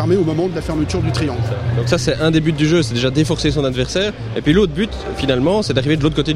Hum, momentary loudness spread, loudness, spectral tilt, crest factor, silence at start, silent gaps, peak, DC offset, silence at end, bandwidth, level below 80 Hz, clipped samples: none; 6 LU; -17 LUFS; -6 dB/octave; 14 dB; 0 s; none; -2 dBFS; under 0.1%; 0 s; 13 kHz; -32 dBFS; under 0.1%